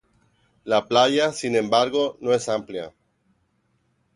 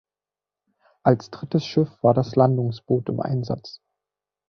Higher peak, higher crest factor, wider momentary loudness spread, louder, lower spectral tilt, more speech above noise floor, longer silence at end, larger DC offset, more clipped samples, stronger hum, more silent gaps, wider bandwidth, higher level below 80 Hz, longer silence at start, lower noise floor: about the same, -4 dBFS vs -2 dBFS; about the same, 20 dB vs 20 dB; first, 16 LU vs 8 LU; about the same, -21 LUFS vs -23 LUFS; second, -4 dB/octave vs -8.5 dB/octave; second, 47 dB vs over 68 dB; first, 1.25 s vs 0.8 s; neither; neither; second, none vs 50 Hz at -45 dBFS; neither; first, 11.5 kHz vs 6.6 kHz; second, -66 dBFS vs -60 dBFS; second, 0.65 s vs 1.05 s; second, -68 dBFS vs under -90 dBFS